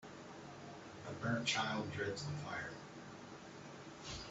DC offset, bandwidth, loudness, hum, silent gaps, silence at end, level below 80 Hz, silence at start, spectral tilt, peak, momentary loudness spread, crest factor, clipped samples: under 0.1%; 8.2 kHz; -43 LUFS; none; none; 0 s; -68 dBFS; 0 s; -4 dB/octave; -22 dBFS; 17 LU; 22 dB; under 0.1%